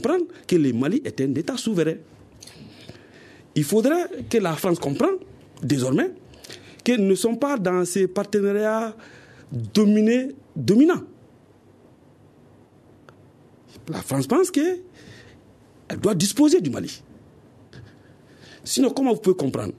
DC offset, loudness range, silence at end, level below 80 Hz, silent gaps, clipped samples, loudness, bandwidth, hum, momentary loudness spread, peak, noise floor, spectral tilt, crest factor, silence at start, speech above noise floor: under 0.1%; 5 LU; 0.05 s; -60 dBFS; none; under 0.1%; -22 LUFS; 14 kHz; none; 17 LU; -6 dBFS; -53 dBFS; -5.5 dB/octave; 18 dB; 0 s; 32 dB